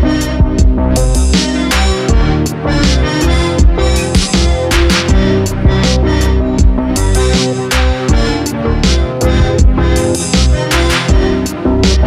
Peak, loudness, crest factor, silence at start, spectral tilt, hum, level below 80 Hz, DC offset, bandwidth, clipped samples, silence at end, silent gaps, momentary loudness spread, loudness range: 0 dBFS; -12 LUFS; 10 dB; 0 s; -5 dB/octave; none; -14 dBFS; under 0.1%; 15 kHz; under 0.1%; 0 s; none; 2 LU; 1 LU